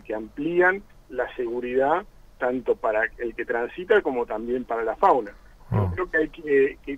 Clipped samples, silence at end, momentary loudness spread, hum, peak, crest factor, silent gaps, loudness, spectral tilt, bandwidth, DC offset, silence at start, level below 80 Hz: under 0.1%; 0 s; 9 LU; none; -6 dBFS; 18 dB; none; -24 LUFS; -8 dB/octave; 8 kHz; under 0.1%; 0.05 s; -48 dBFS